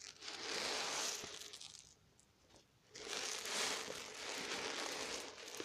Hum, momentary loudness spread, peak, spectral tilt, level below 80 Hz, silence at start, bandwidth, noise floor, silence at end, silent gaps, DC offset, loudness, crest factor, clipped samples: none; 13 LU; -22 dBFS; 0 dB/octave; -78 dBFS; 0 s; 15.5 kHz; -71 dBFS; 0 s; none; under 0.1%; -43 LUFS; 24 dB; under 0.1%